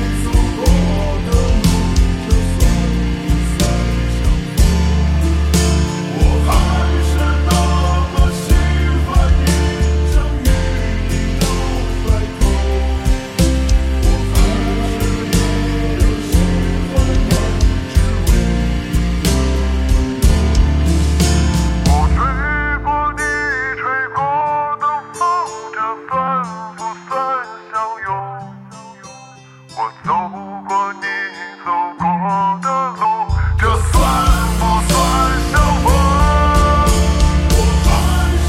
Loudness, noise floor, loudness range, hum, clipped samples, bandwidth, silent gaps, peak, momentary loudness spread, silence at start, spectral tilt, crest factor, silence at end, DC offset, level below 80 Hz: -16 LUFS; -39 dBFS; 8 LU; none; under 0.1%; 16 kHz; none; -2 dBFS; 7 LU; 0 s; -5.5 dB/octave; 14 dB; 0 s; under 0.1%; -16 dBFS